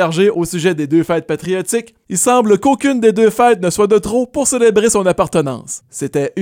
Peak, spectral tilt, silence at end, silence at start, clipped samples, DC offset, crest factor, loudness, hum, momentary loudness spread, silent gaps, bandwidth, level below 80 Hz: 0 dBFS; -4.5 dB/octave; 0 s; 0 s; under 0.1%; under 0.1%; 12 dB; -14 LUFS; none; 9 LU; none; 17 kHz; -46 dBFS